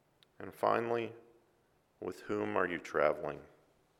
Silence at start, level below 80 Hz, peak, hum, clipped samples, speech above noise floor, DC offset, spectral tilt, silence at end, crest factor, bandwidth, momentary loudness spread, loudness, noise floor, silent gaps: 0.4 s; -72 dBFS; -14 dBFS; none; under 0.1%; 37 dB; under 0.1%; -6 dB/octave; 0.55 s; 24 dB; 16 kHz; 15 LU; -35 LUFS; -72 dBFS; none